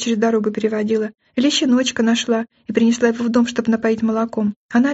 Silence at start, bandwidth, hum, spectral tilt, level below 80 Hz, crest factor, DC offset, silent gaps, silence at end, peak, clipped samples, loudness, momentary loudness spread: 0 s; 8 kHz; none; -3.5 dB/octave; -60 dBFS; 16 dB; under 0.1%; 4.56-4.69 s; 0 s; -2 dBFS; under 0.1%; -18 LUFS; 6 LU